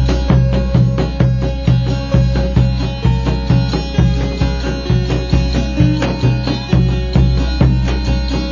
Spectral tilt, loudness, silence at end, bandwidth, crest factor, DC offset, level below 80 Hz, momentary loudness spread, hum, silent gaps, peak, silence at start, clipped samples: -7.5 dB/octave; -15 LUFS; 0 s; 7.2 kHz; 14 dB; under 0.1%; -18 dBFS; 4 LU; none; none; 0 dBFS; 0 s; under 0.1%